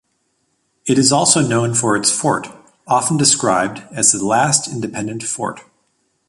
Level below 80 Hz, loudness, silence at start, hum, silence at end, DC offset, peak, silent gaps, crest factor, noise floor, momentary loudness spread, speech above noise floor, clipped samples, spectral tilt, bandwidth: -56 dBFS; -15 LUFS; 0.85 s; none; 0.7 s; under 0.1%; 0 dBFS; none; 18 dB; -66 dBFS; 11 LU; 50 dB; under 0.1%; -3 dB/octave; 11.5 kHz